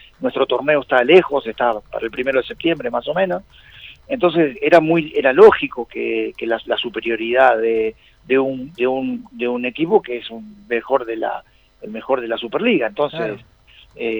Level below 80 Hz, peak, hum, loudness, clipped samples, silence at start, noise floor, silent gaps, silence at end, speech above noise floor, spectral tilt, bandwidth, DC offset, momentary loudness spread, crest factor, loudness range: -52 dBFS; 0 dBFS; none; -18 LUFS; under 0.1%; 0.2 s; -41 dBFS; none; 0 s; 24 dB; -7 dB/octave; over 20 kHz; under 0.1%; 14 LU; 18 dB; 6 LU